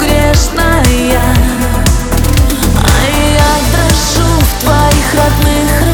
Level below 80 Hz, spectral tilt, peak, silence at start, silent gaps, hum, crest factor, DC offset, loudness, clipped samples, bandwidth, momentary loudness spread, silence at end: -14 dBFS; -4.5 dB/octave; 0 dBFS; 0 s; none; none; 8 dB; under 0.1%; -10 LUFS; under 0.1%; over 20 kHz; 2 LU; 0 s